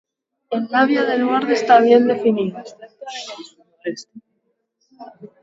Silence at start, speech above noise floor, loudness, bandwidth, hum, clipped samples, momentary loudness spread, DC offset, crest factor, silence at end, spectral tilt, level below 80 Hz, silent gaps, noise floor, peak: 0.5 s; 52 dB; -16 LUFS; 7.8 kHz; none; under 0.1%; 21 LU; under 0.1%; 20 dB; 0.15 s; -5 dB/octave; -70 dBFS; none; -70 dBFS; 0 dBFS